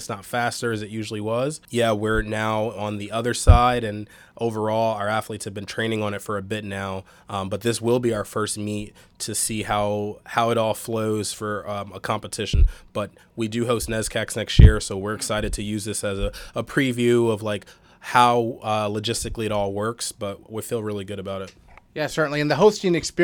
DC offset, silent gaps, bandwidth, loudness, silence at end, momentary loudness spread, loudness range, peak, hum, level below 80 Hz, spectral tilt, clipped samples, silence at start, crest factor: under 0.1%; none; 19 kHz; -23 LUFS; 0 s; 13 LU; 5 LU; 0 dBFS; none; -30 dBFS; -5 dB/octave; under 0.1%; 0 s; 22 dB